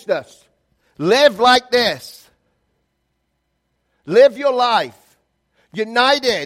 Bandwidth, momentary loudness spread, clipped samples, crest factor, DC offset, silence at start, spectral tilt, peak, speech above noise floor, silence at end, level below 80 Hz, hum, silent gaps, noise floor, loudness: 15.5 kHz; 16 LU; under 0.1%; 18 dB; under 0.1%; 0.1 s; -3.5 dB/octave; 0 dBFS; 55 dB; 0 s; -60 dBFS; none; none; -70 dBFS; -15 LUFS